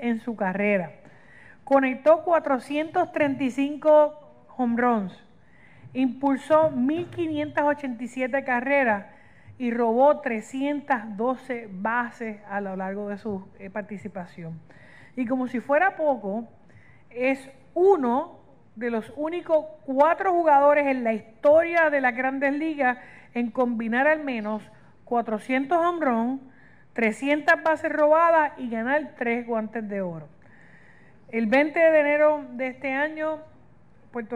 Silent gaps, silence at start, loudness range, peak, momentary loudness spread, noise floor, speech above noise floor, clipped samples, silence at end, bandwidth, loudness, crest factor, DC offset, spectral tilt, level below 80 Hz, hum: none; 0 s; 7 LU; -6 dBFS; 15 LU; -56 dBFS; 33 dB; under 0.1%; 0 s; 11 kHz; -24 LUFS; 18 dB; 0.2%; -6.5 dB/octave; -66 dBFS; none